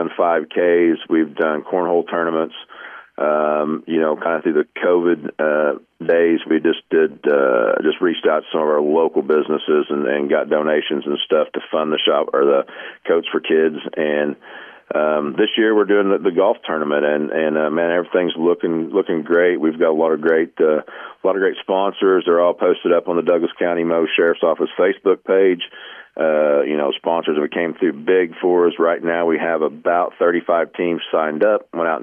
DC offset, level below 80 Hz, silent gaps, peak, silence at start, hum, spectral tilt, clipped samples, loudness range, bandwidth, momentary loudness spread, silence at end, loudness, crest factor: under 0.1%; -70 dBFS; none; -4 dBFS; 0 s; none; -8.5 dB/octave; under 0.1%; 2 LU; 3.6 kHz; 6 LU; 0 s; -18 LUFS; 12 dB